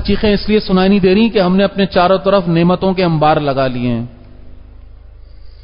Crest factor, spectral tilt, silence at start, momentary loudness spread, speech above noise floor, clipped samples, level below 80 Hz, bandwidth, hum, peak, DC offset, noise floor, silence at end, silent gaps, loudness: 14 dB; -12 dB/octave; 0 s; 6 LU; 23 dB; under 0.1%; -32 dBFS; 5.4 kHz; 50 Hz at -35 dBFS; 0 dBFS; under 0.1%; -35 dBFS; 0.05 s; none; -13 LUFS